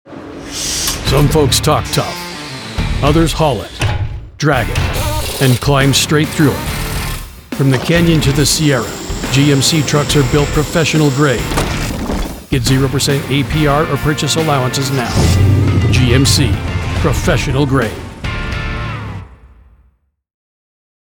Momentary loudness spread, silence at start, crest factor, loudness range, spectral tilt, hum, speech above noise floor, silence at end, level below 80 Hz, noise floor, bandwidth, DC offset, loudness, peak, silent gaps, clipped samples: 11 LU; 0.05 s; 14 dB; 4 LU; -4.5 dB/octave; none; 44 dB; 1.7 s; -26 dBFS; -56 dBFS; 19.5 kHz; under 0.1%; -14 LUFS; 0 dBFS; none; under 0.1%